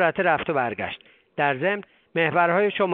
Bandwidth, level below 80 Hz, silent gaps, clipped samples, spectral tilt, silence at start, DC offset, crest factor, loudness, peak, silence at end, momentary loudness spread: 4.4 kHz; -62 dBFS; none; under 0.1%; -3.5 dB/octave; 0 s; under 0.1%; 18 dB; -23 LUFS; -6 dBFS; 0 s; 12 LU